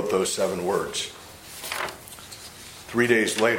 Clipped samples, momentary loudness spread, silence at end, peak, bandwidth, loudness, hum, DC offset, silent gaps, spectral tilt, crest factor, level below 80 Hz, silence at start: under 0.1%; 20 LU; 0 s; -4 dBFS; 16.5 kHz; -25 LUFS; none; under 0.1%; none; -3 dB/octave; 22 dB; -58 dBFS; 0 s